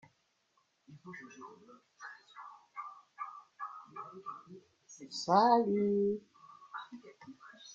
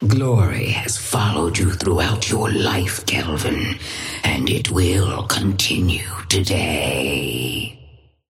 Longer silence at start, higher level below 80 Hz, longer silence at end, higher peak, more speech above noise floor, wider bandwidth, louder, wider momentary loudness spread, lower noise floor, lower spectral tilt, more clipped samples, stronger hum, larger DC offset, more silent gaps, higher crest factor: first, 0.9 s vs 0 s; second, -82 dBFS vs -36 dBFS; second, 0 s vs 0.35 s; second, -14 dBFS vs -4 dBFS; first, 43 dB vs 28 dB; second, 7.8 kHz vs 16.5 kHz; second, -33 LUFS vs -19 LUFS; first, 26 LU vs 5 LU; first, -76 dBFS vs -47 dBFS; about the same, -5.5 dB/octave vs -4.5 dB/octave; neither; neither; neither; neither; first, 24 dB vs 16 dB